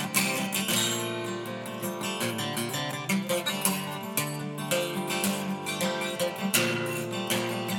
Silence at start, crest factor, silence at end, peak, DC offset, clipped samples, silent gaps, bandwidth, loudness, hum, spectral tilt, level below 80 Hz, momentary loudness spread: 0 s; 22 dB; 0 s; -6 dBFS; under 0.1%; under 0.1%; none; over 20 kHz; -29 LUFS; none; -3 dB/octave; -72 dBFS; 7 LU